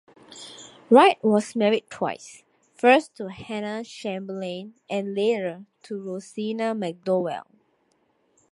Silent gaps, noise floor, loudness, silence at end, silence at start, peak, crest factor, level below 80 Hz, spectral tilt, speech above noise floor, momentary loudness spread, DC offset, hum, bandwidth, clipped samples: none; -67 dBFS; -24 LUFS; 1.1 s; 0.3 s; -2 dBFS; 22 dB; -72 dBFS; -5 dB/octave; 44 dB; 20 LU; under 0.1%; none; 11.5 kHz; under 0.1%